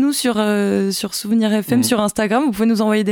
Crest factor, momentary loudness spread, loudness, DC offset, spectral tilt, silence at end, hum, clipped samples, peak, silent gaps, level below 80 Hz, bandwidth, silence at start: 14 dB; 3 LU; -17 LUFS; under 0.1%; -4.5 dB/octave; 0 s; none; under 0.1%; -2 dBFS; none; -54 dBFS; 18 kHz; 0 s